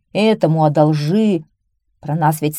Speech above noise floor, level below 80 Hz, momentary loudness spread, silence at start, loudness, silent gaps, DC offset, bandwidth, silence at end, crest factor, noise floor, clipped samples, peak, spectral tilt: 51 dB; -60 dBFS; 10 LU; 0.15 s; -16 LUFS; none; under 0.1%; 14.5 kHz; 0 s; 14 dB; -66 dBFS; under 0.1%; -2 dBFS; -7 dB/octave